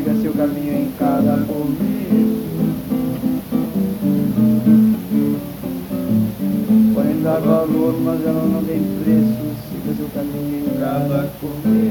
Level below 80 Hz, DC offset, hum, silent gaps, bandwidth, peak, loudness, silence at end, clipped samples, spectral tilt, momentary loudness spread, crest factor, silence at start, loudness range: -46 dBFS; under 0.1%; none; none; 19 kHz; -2 dBFS; -18 LUFS; 0 s; under 0.1%; -8.5 dB/octave; 9 LU; 14 dB; 0 s; 3 LU